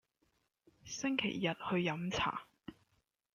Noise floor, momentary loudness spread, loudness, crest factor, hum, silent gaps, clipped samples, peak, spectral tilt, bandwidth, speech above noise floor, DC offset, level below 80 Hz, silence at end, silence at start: -80 dBFS; 19 LU; -37 LUFS; 20 dB; none; none; under 0.1%; -20 dBFS; -4.5 dB/octave; 10 kHz; 43 dB; under 0.1%; -68 dBFS; 0.65 s; 0.85 s